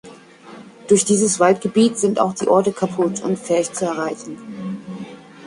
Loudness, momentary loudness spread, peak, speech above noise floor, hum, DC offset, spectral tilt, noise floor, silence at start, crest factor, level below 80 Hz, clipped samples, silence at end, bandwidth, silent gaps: -18 LUFS; 17 LU; -2 dBFS; 24 dB; none; under 0.1%; -4.5 dB/octave; -42 dBFS; 0.05 s; 18 dB; -62 dBFS; under 0.1%; 0 s; 11.5 kHz; none